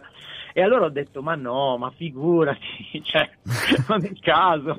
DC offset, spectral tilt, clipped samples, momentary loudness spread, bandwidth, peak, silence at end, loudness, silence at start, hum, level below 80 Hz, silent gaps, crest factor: under 0.1%; -5.5 dB/octave; under 0.1%; 12 LU; 15 kHz; -4 dBFS; 0 s; -22 LUFS; 0.05 s; none; -56 dBFS; none; 18 dB